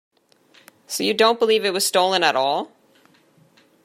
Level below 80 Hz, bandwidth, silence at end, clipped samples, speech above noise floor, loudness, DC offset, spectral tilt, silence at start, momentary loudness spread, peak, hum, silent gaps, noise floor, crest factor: -76 dBFS; 16 kHz; 1.2 s; under 0.1%; 38 dB; -19 LUFS; under 0.1%; -2 dB/octave; 0.9 s; 10 LU; -2 dBFS; none; none; -57 dBFS; 20 dB